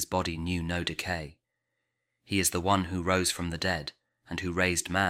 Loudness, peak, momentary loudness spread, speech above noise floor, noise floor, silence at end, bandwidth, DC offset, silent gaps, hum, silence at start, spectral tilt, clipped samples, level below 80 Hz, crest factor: -29 LUFS; -10 dBFS; 9 LU; 53 dB; -82 dBFS; 0 s; 16.5 kHz; under 0.1%; none; none; 0 s; -3.5 dB/octave; under 0.1%; -50 dBFS; 20 dB